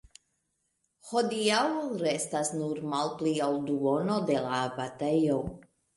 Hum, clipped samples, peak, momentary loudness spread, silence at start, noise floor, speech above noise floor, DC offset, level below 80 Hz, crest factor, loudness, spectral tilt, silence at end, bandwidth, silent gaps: none; under 0.1%; -14 dBFS; 6 LU; 1.05 s; -78 dBFS; 49 dB; under 0.1%; -62 dBFS; 16 dB; -29 LUFS; -4.5 dB/octave; 0.35 s; 11.5 kHz; none